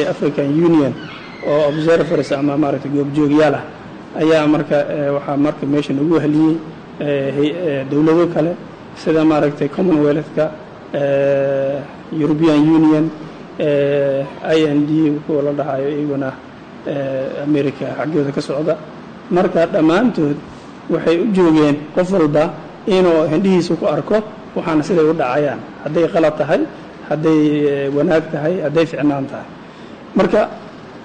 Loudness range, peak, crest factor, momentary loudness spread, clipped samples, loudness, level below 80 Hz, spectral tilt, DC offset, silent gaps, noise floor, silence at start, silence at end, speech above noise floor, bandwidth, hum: 3 LU; -6 dBFS; 10 dB; 13 LU; under 0.1%; -16 LUFS; -50 dBFS; -7.5 dB/octave; under 0.1%; none; -35 dBFS; 0 s; 0 s; 20 dB; 9.2 kHz; none